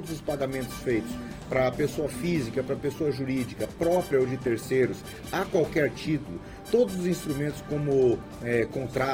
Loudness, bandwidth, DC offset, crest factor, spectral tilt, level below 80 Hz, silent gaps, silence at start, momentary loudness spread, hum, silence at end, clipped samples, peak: -28 LUFS; 17 kHz; under 0.1%; 16 dB; -6 dB/octave; -50 dBFS; none; 0 s; 7 LU; none; 0 s; under 0.1%; -12 dBFS